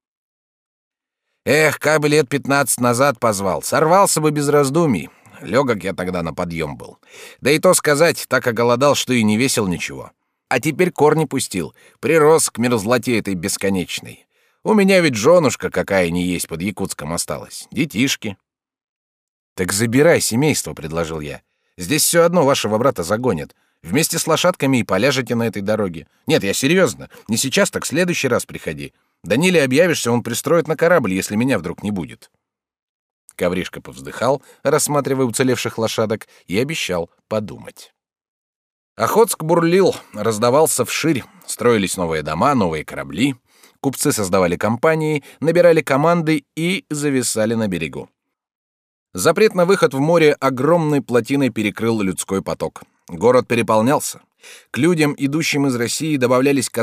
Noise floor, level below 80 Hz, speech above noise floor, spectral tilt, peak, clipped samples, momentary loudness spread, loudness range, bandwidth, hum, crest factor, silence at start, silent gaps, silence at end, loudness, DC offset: -76 dBFS; -52 dBFS; 59 dB; -4.5 dB/octave; -2 dBFS; under 0.1%; 12 LU; 5 LU; 16 kHz; none; 16 dB; 1.45 s; 18.89-19.56 s, 32.82-33.28 s, 38.28-38.96 s, 48.55-49.06 s; 0 s; -17 LUFS; under 0.1%